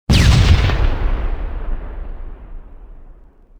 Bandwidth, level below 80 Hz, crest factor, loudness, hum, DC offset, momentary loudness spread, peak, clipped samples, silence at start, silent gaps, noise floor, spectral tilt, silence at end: 14 kHz; -18 dBFS; 16 dB; -16 LUFS; none; under 0.1%; 24 LU; 0 dBFS; under 0.1%; 0.1 s; none; -42 dBFS; -5.5 dB/octave; 0.45 s